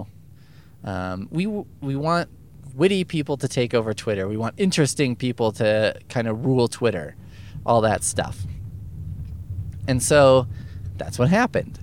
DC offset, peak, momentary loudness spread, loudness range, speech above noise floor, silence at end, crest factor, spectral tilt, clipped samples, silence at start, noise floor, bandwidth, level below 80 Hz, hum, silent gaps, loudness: 0.3%; -4 dBFS; 16 LU; 4 LU; 27 dB; 0 s; 18 dB; -5 dB/octave; under 0.1%; 0 s; -48 dBFS; 17 kHz; -46 dBFS; none; none; -22 LUFS